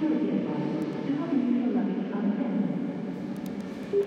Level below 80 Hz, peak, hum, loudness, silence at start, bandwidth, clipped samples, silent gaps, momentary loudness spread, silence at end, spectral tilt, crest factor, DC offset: -68 dBFS; -16 dBFS; none; -29 LUFS; 0 s; 8 kHz; under 0.1%; none; 8 LU; 0 s; -8.5 dB/octave; 12 dB; under 0.1%